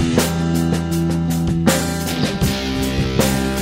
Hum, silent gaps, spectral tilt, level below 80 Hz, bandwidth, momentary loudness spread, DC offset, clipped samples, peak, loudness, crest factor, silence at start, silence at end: none; none; -5 dB/octave; -30 dBFS; 16.5 kHz; 3 LU; under 0.1%; under 0.1%; 0 dBFS; -18 LUFS; 18 dB; 0 s; 0 s